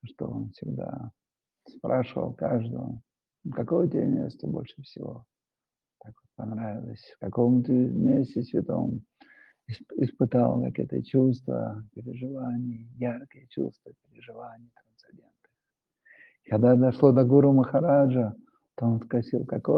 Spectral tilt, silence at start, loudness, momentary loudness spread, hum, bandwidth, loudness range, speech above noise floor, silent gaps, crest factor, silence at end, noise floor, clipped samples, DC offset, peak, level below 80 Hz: -11.5 dB/octave; 0.05 s; -26 LUFS; 20 LU; none; 5.4 kHz; 14 LU; over 64 dB; none; 22 dB; 0 s; under -90 dBFS; under 0.1%; under 0.1%; -6 dBFS; -66 dBFS